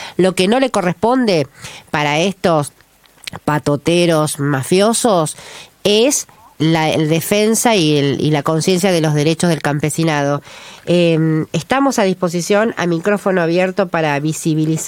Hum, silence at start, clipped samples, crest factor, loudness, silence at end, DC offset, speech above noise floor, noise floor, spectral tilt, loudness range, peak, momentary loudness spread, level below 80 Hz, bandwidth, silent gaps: none; 0 s; under 0.1%; 14 dB; -15 LUFS; 0 s; under 0.1%; 21 dB; -36 dBFS; -5 dB/octave; 3 LU; 0 dBFS; 7 LU; -52 dBFS; 17 kHz; none